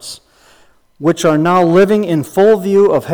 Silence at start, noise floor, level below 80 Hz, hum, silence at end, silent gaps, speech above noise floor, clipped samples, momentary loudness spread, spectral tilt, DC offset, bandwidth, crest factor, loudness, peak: 0.05 s; -48 dBFS; -52 dBFS; none; 0 s; none; 37 dB; under 0.1%; 7 LU; -6.5 dB/octave; under 0.1%; over 20 kHz; 10 dB; -12 LUFS; -2 dBFS